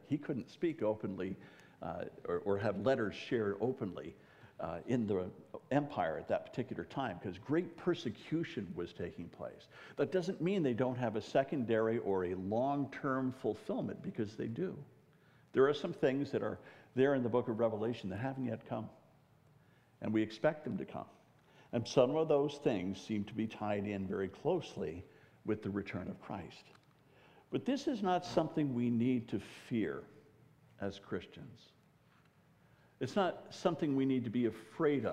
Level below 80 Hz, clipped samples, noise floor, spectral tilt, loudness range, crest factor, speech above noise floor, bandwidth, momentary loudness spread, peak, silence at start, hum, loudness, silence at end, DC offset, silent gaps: -72 dBFS; under 0.1%; -68 dBFS; -7 dB/octave; 6 LU; 22 dB; 31 dB; 11.5 kHz; 12 LU; -14 dBFS; 0.05 s; none; -37 LUFS; 0 s; under 0.1%; none